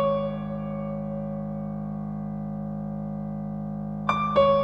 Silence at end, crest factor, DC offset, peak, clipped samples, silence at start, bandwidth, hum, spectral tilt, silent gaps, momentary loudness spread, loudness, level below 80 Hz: 0 s; 20 dB; under 0.1%; -8 dBFS; under 0.1%; 0 s; 6.4 kHz; 50 Hz at -85 dBFS; -8.5 dB/octave; none; 9 LU; -29 LUFS; -48 dBFS